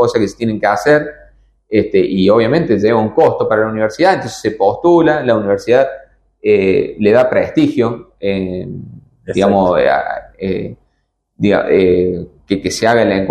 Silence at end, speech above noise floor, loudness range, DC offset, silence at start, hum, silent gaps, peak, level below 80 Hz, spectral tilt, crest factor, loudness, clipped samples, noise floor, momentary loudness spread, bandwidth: 0 s; 53 dB; 3 LU; under 0.1%; 0 s; none; none; 0 dBFS; -46 dBFS; -6.5 dB/octave; 14 dB; -14 LUFS; under 0.1%; -65 dBFS; 11 LU; 12.5 kHz